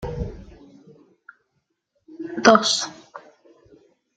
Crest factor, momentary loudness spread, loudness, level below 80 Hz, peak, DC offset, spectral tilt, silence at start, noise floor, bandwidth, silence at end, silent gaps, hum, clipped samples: 24 dB; 28 LU; -19 LUFS; -46 dBFS; -2 dBFS; under 0.1%; -3 dB/octave; 0 s; -74 dBFS; 9.4 kHz; 0.95 s; none; none; under 0.1%